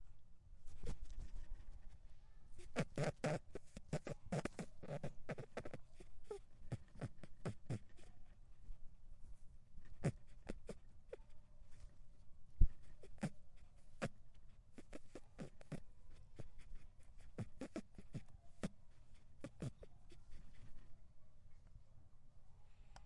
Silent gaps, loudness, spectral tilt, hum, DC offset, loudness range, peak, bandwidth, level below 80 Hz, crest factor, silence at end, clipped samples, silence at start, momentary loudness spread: none; -51 LUFS; -6.5 dB/octave; none; under 0.1%; 10 LU; -16 dBFS; 11 kHz; -52 dBFS; 30 dB; 0 s; under 0.1%; 0 s; 22 LU